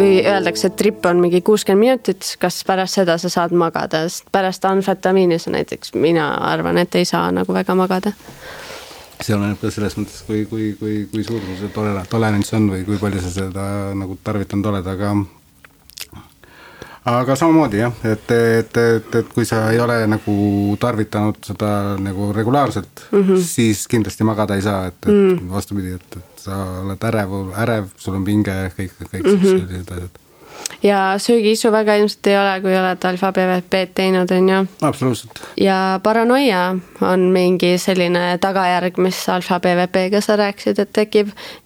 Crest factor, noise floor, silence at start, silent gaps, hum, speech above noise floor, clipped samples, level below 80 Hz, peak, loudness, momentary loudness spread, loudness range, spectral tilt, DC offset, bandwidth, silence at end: 16 dB; -48 dBFS; 0 s; none; none; 32 dB; under 0.1%; -50 dBFS; 0 dBFS; -17 LUFS; 11 LU; 6 LU; -5.5 dB/octave; under 0.1%; over 20 kHz; 0.1 s